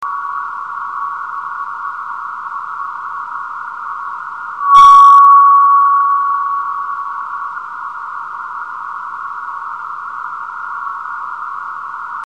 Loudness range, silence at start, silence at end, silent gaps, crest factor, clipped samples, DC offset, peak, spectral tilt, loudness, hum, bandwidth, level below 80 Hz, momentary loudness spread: 16 LU; 0 s; 0.1 s; none; 14 dB; 0.3%; 0.3%; 0 dBFS; -0.5 dB/octave; -12 LUFS; none; 8.6 kHz; -56 dBFS; 19 LU